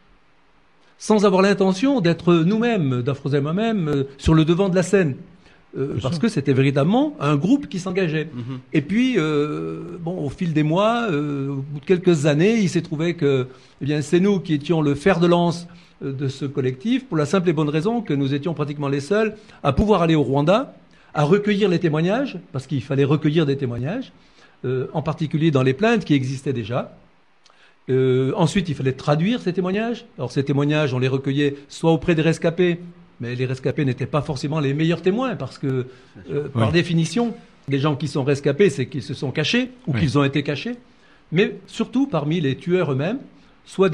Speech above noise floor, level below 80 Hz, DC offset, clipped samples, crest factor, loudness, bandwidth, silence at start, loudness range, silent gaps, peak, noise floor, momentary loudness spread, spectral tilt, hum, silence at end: 39 dB; -46 dBFS; 0.1%; under 0.1%; 16 dB; -21 LUFS; 10.5 kHz; 1 s; 3 LU; none; -4 dBFS; -59 dBFS; 10 LU; -7 dB/octave; none; 0 s